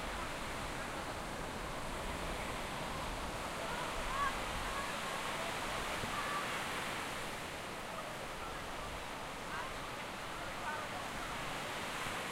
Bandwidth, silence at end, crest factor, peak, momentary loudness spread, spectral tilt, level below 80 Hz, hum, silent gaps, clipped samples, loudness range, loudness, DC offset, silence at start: 16 kHz; 0 s; 16 dB; -24 dBFS; 5 LU; -3 dB/octave; -52 dBFS; none; none; under 0.1%; 4 LU; -40 LUFS; under 0.1%; 0 s